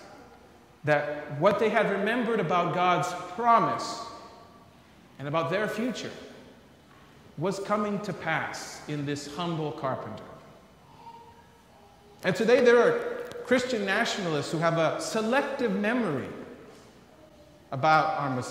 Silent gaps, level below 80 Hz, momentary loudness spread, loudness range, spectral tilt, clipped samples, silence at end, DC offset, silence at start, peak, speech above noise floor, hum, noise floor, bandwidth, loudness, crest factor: none; -66 dBFS; 17 LU; 9 LU; -5 dB/octave; under 0.1%; 0 s; under 0.1%; 0 s; -8 dBFS; 29 dB; none; -55 dBFS; 15.5 kHz; -27 LUFS; 20 dB